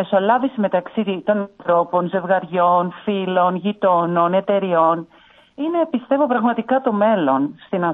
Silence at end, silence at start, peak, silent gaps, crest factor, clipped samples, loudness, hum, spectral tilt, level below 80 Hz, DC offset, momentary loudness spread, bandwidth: 0 s; 0 s; -4 dBFS; none; 16 dB; under 0.1%; -19 LUFS; none; -9.5 dB/octave; -68 dBFS; under 0.1%; 6 LU; 4 kHz